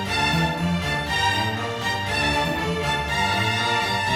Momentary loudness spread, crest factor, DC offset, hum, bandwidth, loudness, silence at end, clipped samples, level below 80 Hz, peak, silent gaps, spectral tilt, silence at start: 4 LU; 14 dB; under 0.1%; none; 17 kHz; -22 LUFS; 0 s; under 0.1%; -40 dBFS; -8 dBFS; none; -4 dB/octave; 0 s